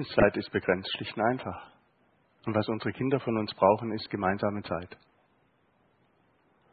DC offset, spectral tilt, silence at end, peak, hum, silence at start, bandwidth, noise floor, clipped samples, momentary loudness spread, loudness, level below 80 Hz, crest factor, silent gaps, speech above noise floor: under 0.1%; -10 dB/octave; 1.8 s; -8 dBFS; none; 0 s; 4.9 kHz; -69 dBFS; under 0.1%; 12 LU; -29 LUFS; -54 dBFS; 24 dB; none; 40 dB